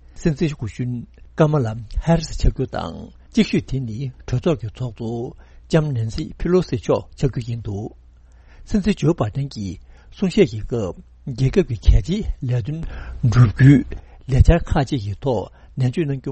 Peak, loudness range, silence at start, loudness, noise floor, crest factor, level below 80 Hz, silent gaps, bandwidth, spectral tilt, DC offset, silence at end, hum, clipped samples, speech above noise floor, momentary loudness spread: 0 dBFS; 6 LU; 0.15 s; -21 LUFS; -47 dBFS; 20 dB; -28 dBFS; none; 8.4 kHz; -7.5 dB/octave; under 0.1%; 0 s; none; under 0.1%; 28 dB; 15 LU